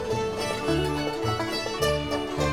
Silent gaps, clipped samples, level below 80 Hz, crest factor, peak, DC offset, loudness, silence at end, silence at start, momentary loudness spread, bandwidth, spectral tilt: none; under 0.1%; -42 dBFS; 14 dB; -12 dBFS; under 0.1%; -27 LUFS; 0 s; 0 s; 3 LU; 17.5 kHz; -5 dB/octave